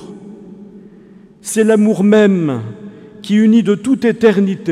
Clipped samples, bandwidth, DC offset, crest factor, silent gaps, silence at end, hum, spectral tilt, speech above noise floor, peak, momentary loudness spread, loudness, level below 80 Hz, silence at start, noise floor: under 0.1%; 13.5 kHz; under 0.1%; 14 dB; none; 0 s; none; -6.5 dB/octave; 29 dB; 0 dBFS; 21 LU; -13 LUFS; -58 dBFS; 0 s; -41 dBFS